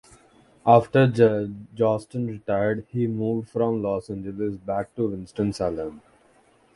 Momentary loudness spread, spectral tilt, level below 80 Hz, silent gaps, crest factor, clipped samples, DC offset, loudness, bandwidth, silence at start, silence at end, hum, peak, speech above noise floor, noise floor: 12 LU; -8 dB/octave; -54 dBFS; none; 22 dB; under 0.1%; under 0.1%; -24 LUFS; 11.5 kHz; 0.65 s; 0.75 s; none; -2 dBFS; 36 dB; -59 dBFS